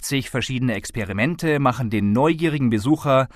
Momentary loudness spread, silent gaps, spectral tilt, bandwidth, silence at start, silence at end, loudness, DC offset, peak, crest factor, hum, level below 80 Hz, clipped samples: 6 LU; none; -6 dB/octave; 14 kHz; 0 s; 0.1 s; -21 LUFS; under 0.1%; -6 dBFS; 16 dB; none; -46 dBFS; under 0.1%